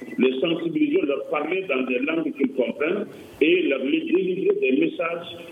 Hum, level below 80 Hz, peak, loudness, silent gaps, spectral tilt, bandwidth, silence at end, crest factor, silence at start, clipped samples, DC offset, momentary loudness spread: none; -70 dBFS; -6 dBFS; -23 LUFS; none; -7 dB/octave; 8 kHz; 0 s; 16 dB; 0 s; under 0.1%; under 0.1%; 5 LU